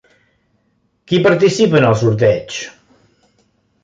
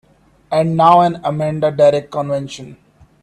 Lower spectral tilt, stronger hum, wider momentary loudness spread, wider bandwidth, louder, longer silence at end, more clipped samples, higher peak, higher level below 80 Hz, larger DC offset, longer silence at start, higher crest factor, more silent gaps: about the same, -6 dB/octave vs -7 dB/octave; neither; first, 15 LU vs 12 LU; second, 9.2 kHz vs 11 kHz; about the same, -14 LUFS vs -15 LUFS; first, 1.15 s vs 0.5 s; neither; about the same, 0 dBFS vs 0 dBFS; about the same, -50 dBFS vs -54 dBFS; neither; first, 1.1 s vs 0.5 s; about the same, 16 dB vs 16 dB; neither